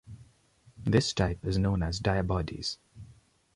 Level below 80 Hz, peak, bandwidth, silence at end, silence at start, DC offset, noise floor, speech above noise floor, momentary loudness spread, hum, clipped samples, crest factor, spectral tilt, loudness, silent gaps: -42 dBFS; -10 dBFS; 11.5 kHz; 0.45 s; 0.05 s; under 0.1%; -62 dBFS; 34 dB; 9 LU; none; under 0.1%; 20 dB; -5.5 dB/octave; -30 LUFS; none